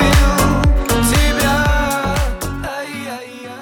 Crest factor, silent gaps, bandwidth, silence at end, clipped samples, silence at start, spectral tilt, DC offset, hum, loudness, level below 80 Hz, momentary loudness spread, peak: 12 dB; none; 19 kHz; 0 s; under 0.1%; 0 s; -4.5 dB/octave; under 0.1%; none; -16 LUFS; -20 dBFS; 13 LU; -2 dBFS